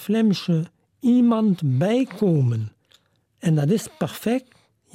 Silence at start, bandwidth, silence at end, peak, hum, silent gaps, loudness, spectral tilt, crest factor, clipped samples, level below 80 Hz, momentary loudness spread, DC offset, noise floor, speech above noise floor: 0 s; 16.5 kHz; 0.55 s; -10 dBFS; none; none; -22 LUFS; -7.5 dB/octave; 12 dB; under 0.1%; -64 dBFS; 10 LU; under 0.1%; -61 dBFS; 41 dB